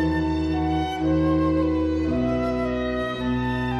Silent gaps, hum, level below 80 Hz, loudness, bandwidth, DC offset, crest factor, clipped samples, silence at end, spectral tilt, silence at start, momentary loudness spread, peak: none; none; -34 dBFS; -23 LUFS; 7.6 kHz; under 0.1%; 12 dB; under 0.1%; 0 s; -8 dB/octave; 0 s; 4 LU; -12 dBFS